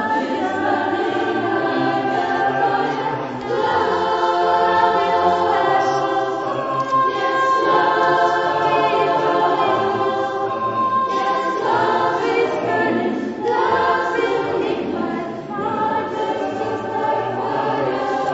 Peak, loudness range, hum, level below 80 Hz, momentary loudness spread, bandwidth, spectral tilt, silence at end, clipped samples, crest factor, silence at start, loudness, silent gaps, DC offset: -4 dBFS; 4 LU; none; -58 dBFS; 7 LU; 8 kHz; -5.5 dB/octave; 0 s; under 0.1%; 14 dB; 0 s; -19 LUFS; none; under 0.1%